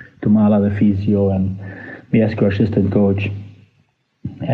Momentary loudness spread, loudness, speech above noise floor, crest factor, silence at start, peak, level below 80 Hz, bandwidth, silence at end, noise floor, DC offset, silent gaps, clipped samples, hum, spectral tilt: 18 LU; -17 LUFS; 46 dB; 14 dB; 0 s; -2 dBFS; -50 dBFS; 4.5 kHz; 0 s; -61 dBFS; under 0.1%; none; under 0.1%; none; -10.5 dB/octave